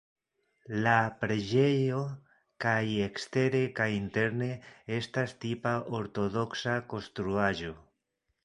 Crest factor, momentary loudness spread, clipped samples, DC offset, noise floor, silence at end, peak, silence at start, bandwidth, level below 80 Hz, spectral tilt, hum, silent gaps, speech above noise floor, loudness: 22 dB; 10 LU; under 0.1%; under 0.1%; -81 dBFS; 0.65 s; -10 dBFS; 0.7 s; 11 kHz; -60 dBFS; -6.5 dB/octave; none; none; 51 dB; -31 LUFS